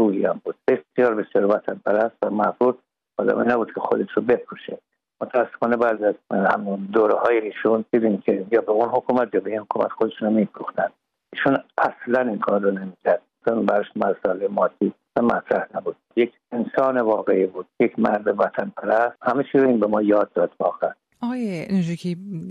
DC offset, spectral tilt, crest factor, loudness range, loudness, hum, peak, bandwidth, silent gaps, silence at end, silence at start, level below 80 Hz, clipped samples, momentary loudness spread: under 0.1%; -8 dB/octave; 16 dB; 2 LU; -22 LUFS; none; -4 dBFS; 8.8 kHz; none; 0 s; 0 s; -66 dBFS; under 0.1%; 7 LU